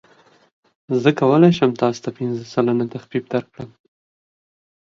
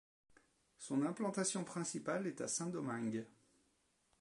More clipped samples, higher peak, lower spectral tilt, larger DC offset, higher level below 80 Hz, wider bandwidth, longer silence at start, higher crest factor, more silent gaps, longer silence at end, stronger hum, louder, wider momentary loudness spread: neither; first, 0 dBFS vs -24 dBFS; first, -7.5 dB/octave vs -4.5 dB/octave; neither; first, -62 dBFS vs -84 dBFS; second, 7.4 kHz vs 11.5 kHz; about the same, 0.9 s vs 0.8 s; about the same, 20 dB vs 18 dB; neither; first, 1.2 s vs 0.9 s; neither; first, -19 LUFS vs -41 LUFS; first, 14 LU vs 6 LU